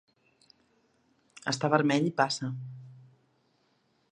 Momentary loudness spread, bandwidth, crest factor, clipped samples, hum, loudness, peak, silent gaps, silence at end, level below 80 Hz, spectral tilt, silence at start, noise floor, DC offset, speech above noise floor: 18 LU; 10 kHz; 26 dB; under 0.1%; none; -29 LUFS; -6 dBFS; none; 1.15 s; -78 dBFS; -5 dB/octave; 1.45 s; -71 dBFS; under 0.1%; 43 dB